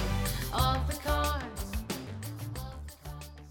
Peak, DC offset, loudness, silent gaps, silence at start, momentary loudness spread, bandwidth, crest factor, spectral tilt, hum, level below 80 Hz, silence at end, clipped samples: -14 dBFS; under 0.1%; -33 LUFS; none; 0 s; 16 LU; 19.5 kHz; 20 dB; -4.5 dB/octave; none; -38 dBFS; 0 s; under 0.1%